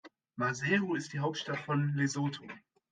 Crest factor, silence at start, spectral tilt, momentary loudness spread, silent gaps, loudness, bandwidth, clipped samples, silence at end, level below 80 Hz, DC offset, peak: 18 dB; 0.05 s; -5.5 dB/octave; 17 LU; none; -33 LUFS; 9.4 kHz; under 0.1%; 0.35 s; -76 dBFS; under 0.1%; -16 dBFS